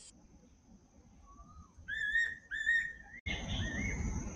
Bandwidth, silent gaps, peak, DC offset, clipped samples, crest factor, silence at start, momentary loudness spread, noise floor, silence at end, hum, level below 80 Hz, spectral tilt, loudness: 10 kHz; 3.20-3.26 s; -22 dBFS; under 0.1%; under 0.1%; 18 dB; 0 s; 22 LU; -62 dBFS; 0 s; none; -48 dBFS; -3.5 dB/octave; -35 LUFS